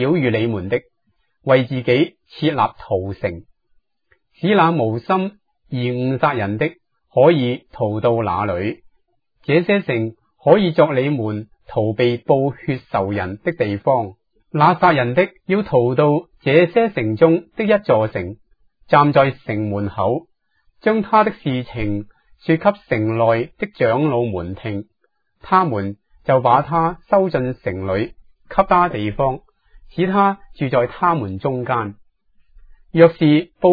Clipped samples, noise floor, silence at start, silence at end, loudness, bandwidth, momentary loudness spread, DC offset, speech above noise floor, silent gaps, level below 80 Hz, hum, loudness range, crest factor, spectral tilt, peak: under 0.1%; -66 dBFS; 0 s; 0 s; -18 LUFS; 5 kHz; 12 LU; under 0.1%; 49 dB; none; -48 dBFS; none; 4 LU; 18 dB; -10 dB/octave; 0 dBFS